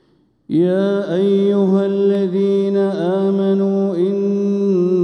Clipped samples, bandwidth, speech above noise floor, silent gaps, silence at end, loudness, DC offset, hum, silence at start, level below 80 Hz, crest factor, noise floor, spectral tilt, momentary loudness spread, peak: under 0.1%; 6.4 kHz; 29 dB; none; 0 s; -16 LUFS; under 0.1%; none; 0.5 s; -70 dBFS; 10 dB; -45 dBFS; -9 dB/octave; 3 LU; -6 dBFS